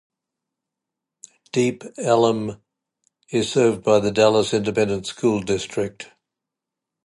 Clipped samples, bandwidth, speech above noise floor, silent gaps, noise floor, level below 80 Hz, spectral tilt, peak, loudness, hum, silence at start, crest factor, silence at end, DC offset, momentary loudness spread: under 0.1%; 11.5 kHz; 65 dB; none; -85 dBFS; -56 dBFS; -5 dB/octave; -4 dBFS; -21 LUFS; none; 1.55 s; 18 dB; 1 s; under 0.1%; 11 LU